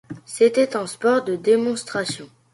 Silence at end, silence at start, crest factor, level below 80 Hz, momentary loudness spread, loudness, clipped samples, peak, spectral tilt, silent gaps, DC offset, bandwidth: 0.3 s; 0.1 s; 16 dB; -66 dBFS; 11 LU; -21 LUFS; under 0.1%; -4 dBFS; -4 dB/octave; none; under 0.1%; 11.5 kHz